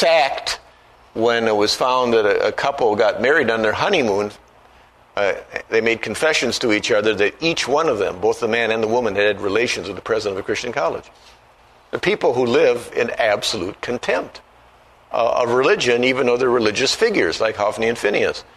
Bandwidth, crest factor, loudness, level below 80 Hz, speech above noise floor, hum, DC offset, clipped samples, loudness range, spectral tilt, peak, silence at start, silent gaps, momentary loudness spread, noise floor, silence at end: 13.5 kHz; 18 dB; -18 LUFS; -52 dBFS; 32 dB; 60 Hz at -50 dBFS; under 0.1%; under 0.1%; 3 LU; -3.5 dB/octave; -2 dBFS; 0 s; none; 7 LU; -50 dBFS; 0.15 s